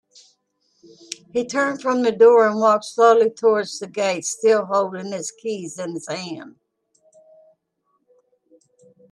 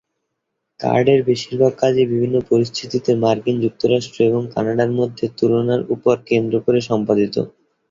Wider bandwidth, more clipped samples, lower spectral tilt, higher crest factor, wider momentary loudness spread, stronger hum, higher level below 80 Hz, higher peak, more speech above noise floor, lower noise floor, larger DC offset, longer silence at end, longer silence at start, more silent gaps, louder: first, 11.5 kHz vs 7.6 kHz; neither; second, -3.5 dB/octave vs -7 dB/octave; about the same, 18 dB vs 16 dB; first, 15 LU vs 5 LU; neither; second, -74 dBFS vs -56 dBFS; about the same, -2 dBFS vs -2 dBFS; second, 52 dB vs 59 dB; second, -71 dBFS vs -76 dBFS; neither; first, 2.6 s vs 0.4 s; first, 1.1 s vs 0.8 s; neither; about the same, -19 LUFS vs -18 LUFS